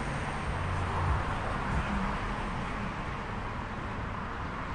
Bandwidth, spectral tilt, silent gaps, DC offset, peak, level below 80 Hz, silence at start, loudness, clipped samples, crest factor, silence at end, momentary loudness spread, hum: 11 kHz; -6 dB/octave; none; under 0.1%; -18 dBFS; -40 dBFS; 0 s; -34 LUFS; under 0.1%; 14 dB; 0 s; 6 LU; none